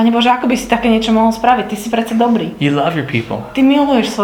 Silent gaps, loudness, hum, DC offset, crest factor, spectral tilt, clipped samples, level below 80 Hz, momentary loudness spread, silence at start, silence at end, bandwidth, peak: none; -14 LUFS; none; under 0.1%; 14 dB; -5.5 dB/octave; under 0.1%; -42 dBFS; 7 LU; 0 s; 0 s; 17 kHz; 0 dBFS